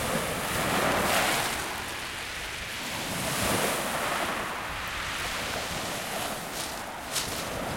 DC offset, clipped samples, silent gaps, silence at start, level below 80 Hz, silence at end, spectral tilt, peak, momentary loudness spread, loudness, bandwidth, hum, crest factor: under 0.1%; under 0.1%; none; 0 s; -50 dBFS; 0 s; -2.5 dB/octave; -10 dBFS; 9 LU; -29 LUFS; 16.5 kHz; none; 20 dB